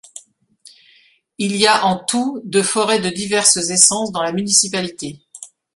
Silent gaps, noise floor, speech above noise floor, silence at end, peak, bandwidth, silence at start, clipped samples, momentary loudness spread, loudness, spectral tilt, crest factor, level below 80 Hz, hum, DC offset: none; -54 dBFS; 37 dB; 0.3 s; 0 dBFS; 16 kHz; 0.15 s; under 0.1%; 18 LU; -15 LUFS; -2 dB/octave; 18 dB; -60 dBFS; none; under 0.1%